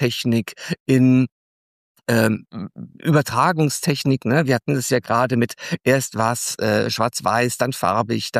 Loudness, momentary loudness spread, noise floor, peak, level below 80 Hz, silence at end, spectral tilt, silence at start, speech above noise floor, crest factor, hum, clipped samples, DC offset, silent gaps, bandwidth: -20 LUFS; 10 LU; under -90 dBFS; -4 dBFS; -60 dBFS; 0 s; -5 dB/octave; 0 s; over 71 dB; 16 dB; none; under 0.1%; under 0.1%; 0.80-0.86 s, 1.32-1.95 s; 15.5 kHz